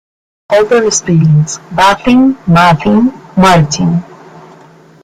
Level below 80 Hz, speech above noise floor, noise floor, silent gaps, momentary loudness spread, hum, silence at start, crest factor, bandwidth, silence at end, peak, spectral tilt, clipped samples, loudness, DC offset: -38 dBFS; 31 dB; -39 dBFS; none; 6 LU; none; 0.5 s; 10 dB; 13.5 kHz; 0.65 s; 0 dBFS; -5.5 dB/octave; under 0.1%; -9 LUFS; under 0.1%